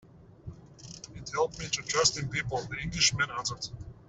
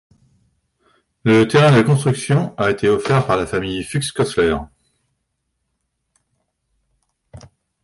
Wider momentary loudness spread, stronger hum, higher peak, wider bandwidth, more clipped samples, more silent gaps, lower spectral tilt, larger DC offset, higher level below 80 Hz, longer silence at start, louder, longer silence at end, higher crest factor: first, 23 LU vs 11 LU; neither; second, -10 dBFS vs -2 dBFS; second, 8.4 kHz vs 11.5 kHz; neither; neither; second, -2 dB/octave vs -6 dB/octave; neither; second, -54 dBFS vs -46 dBFS; second, 0.05 s vs 1.25 s; second, -29 LUFS vs -17 LUFS; second, 0.05 s vs 0.45 s; first, 22 dB vs 16 dB